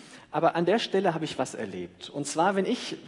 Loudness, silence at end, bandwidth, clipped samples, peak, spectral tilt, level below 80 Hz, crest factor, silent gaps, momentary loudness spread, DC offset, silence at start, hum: -28 LUFS; 0 s; 11 kHz; under 0.1%; -10 dBFS; -4.5 dB/octave; -72 dBFS; 18 dB; none; 11 LU; under 0.1%; 0 s; none